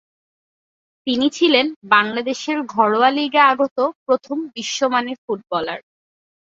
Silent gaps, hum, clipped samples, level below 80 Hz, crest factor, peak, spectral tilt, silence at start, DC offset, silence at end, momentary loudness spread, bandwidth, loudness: 1.76-1.81 s, 3.71-3.76 s, 3.95-4.06 s, 5.18-5.28 s; none; under 0.1%; -66 dBFS; 20 dB; 0 dBFS; -3 dB/octave; 1.05 s; under 0.1%; 0.7 s; 11 LU; 7.8 kHz; -18 LUFS